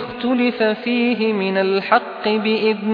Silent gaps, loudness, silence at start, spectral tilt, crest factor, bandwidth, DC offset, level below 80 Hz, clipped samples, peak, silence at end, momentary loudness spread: none; -18 LUFS; 0 s; -8 dB/octave; 18 dB; 5.2 kHz; under 0.1%; -62 dBFS; under 0.1%; 0 dBFS; 0 s; 3 LU